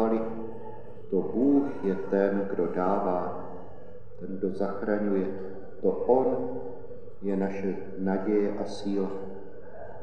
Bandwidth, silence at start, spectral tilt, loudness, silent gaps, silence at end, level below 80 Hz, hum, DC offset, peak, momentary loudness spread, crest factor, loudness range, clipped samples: 9 kHz; 0 s; -8.5 dB/octave; -29 LUFS; none; 0 s; -60 dBFS; none; 2%; -10 dBFS; 20 LU; 20 dB; 3 LU; under 0.1%